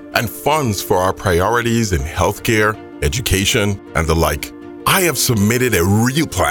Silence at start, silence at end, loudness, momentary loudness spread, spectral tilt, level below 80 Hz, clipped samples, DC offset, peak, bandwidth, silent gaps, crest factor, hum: 0 s; 0 s; -16 LUFS; 5 LU; -4.5 dB/octave; -30 dBFS; under 0.1%; under 0.1%; 0 dBFS; over 20 kHz; none; 16 dB; none